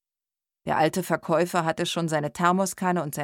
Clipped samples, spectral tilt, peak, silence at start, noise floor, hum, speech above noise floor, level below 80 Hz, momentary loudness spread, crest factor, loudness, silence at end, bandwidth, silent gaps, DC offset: under 0.1%; -5 dB/octave; -6 dBFS; 0.65 s; under -90 dBFS; none; over 65 dB; -64 dBFS; 5 LU; 18 dB; -25 LUFS; 0 s; 17.5 kHz; none; under 0.1%